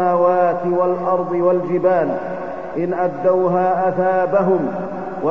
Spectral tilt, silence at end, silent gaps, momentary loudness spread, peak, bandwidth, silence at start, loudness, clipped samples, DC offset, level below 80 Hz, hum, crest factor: -9.5 dB/octave; 0 s; none; 9 LU; -4 dBFS; 6 kHz; 0 s; -18 LUFS; under 0.1%; 1%; -56 dBFS; none; 14 dB